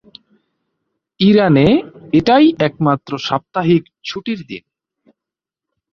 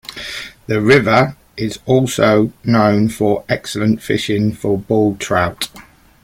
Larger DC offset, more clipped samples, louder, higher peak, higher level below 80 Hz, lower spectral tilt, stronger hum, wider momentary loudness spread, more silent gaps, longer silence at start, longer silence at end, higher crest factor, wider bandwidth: neither; neither; about the same, -15 LUFS vs -16 LUFS; about the same, -2 dBFS vs 0 dBFS; about the same, -48 dBFS vs -46 dBFS; first, -7.5 dB/octave vs -6 dB/octave; neither; about the same, 15 LU vs 13 LU; neither; first, 1.2 s vs 0.1 s; first, 1.35 s vs 0.4 s; about the same, 14 dB vs 16 dB; second, 6.8 kHz vs 16.5 kHz